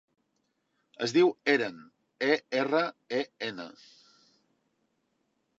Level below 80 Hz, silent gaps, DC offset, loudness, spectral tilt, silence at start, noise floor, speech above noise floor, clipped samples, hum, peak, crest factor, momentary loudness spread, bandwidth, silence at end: -86 dBFS; none; under 0.1%; -29 LUFS; -4.5 dB/octave; 1 s; -77 dBFS; 49 dB; under 0.1%; none; -10 dBFS; 22 dB; 12 LU; 8 kHz; 1.9 s